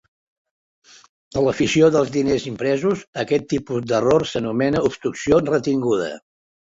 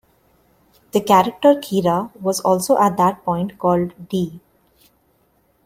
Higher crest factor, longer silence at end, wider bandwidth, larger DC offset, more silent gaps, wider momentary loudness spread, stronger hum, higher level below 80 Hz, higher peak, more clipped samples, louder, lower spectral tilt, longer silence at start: about the same, 18 dB vs 18 dB; second, 0.55 s vs 1.3 s; second, 8 kHz vs 16.5 kHz; neither; first, 3.07-3.13 s vs none; about the same, 8 LU vs 9 LU; neither; first, -50 dBFS vs -56 dBFS; about the same, -4 dBFS vs -2 dBFS; neither; about the same, -20 LUFS vs -18 LUFS; about the same, -5.5 dB/octave vs -5.5 dB/octave; first, 1.35 s vs 0.95 s